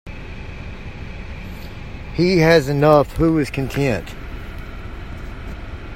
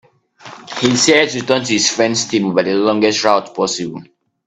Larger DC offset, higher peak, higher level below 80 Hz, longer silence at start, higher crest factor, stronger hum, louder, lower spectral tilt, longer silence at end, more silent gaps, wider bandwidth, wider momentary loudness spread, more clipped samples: neither; about the same, 0 dBFS vs 0 dBFS; first, -34 dBFS vs -58 dBFS; second, 0.05 s vs 0.45 s; about the same, 20 dB vs 16 dB; neither; second, -17 LUFS vs -14 LUFS; first, -6.5 dB/octave vs -3 dB/octave; second, 0 s vs 0.45 s; neither; first, 16 kHz vs 9.4 kHz; first, 20 LU vs 13 LU; neither